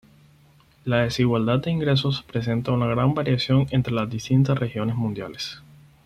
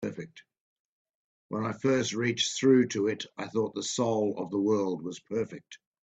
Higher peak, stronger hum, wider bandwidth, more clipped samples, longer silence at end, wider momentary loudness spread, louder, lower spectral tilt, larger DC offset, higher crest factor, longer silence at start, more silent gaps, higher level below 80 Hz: first, -6 dBFS vs -10 dBFS; neither; about the same, 9.4 kHz vs 9 kHz; neither; about the same, 0.45 s vs 0.35 s; second, 10 LU vs 14 LU; first, -23 LUFS vs -29 LUFS; first, -7 dB/octave vs -4.5 dB/octave; neither; about the same, 16 dB vs 20 dB; first, 0.85 s vs 0 s; second, none vs 0.60-1.49 s; first, -50 dBFS vs -72 dBFS